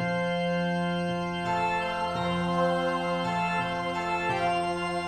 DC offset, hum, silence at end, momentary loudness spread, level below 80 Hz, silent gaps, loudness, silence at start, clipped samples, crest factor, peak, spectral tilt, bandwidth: under 0.1%; none; 0 s; 3 LU; -58 dBFS; none; -28 LUFS; 0 s; under 0.1%; 14 dB; -14 dBFS; -6 dB/octave; 12 kHz